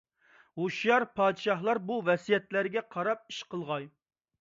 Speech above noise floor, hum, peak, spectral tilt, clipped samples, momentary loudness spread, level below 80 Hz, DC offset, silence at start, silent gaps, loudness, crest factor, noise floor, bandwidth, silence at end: 33 dB; none; -14 dBFS; -5.5 dB/octave; under 0.1%; 11 LU; -76 dBFS; under 0.1%; 0.55 s; none; -30 LUFS; 18 dB; -63 dBFS; 7.8 kHz; 0.5 s